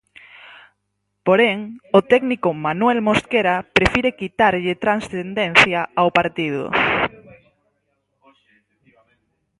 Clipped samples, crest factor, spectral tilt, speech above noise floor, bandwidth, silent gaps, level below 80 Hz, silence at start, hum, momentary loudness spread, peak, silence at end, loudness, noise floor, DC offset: under 0.1%; 20 dB; -5 dB/octave; 56 dB; 11.5 kHz; none; -46 dBFS; 0.45 s; 50 Hz at -50 dBFS; 8 LU; 0 dBFS; 2.5 s; -18 LUFS; -74 dBFS; under 0.1%